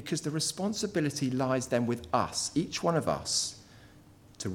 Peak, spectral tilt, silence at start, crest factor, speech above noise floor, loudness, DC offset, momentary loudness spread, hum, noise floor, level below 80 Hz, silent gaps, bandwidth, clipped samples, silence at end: -12 dBFS; -4 dB/octave; 0 s; 20 dB; 25 dB; -31 LUFS; under 0.1%; 4 LU; none; -56 dBFS; -60 dBFS; none; 18 kHz; under 0.1%; 0 s